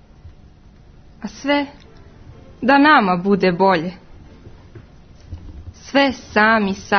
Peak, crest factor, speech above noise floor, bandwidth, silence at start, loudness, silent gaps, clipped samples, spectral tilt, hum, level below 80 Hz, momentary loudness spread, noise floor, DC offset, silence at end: 0 dBFS; 18 dB; 29 dB; 6.6 kHz; 0.25 s; -16 LUFS; none; under 0.1%; -5.5 dB/octave; none; -46 dBFS; 25 LU; -45 dBFS; under 0.1%; 0 s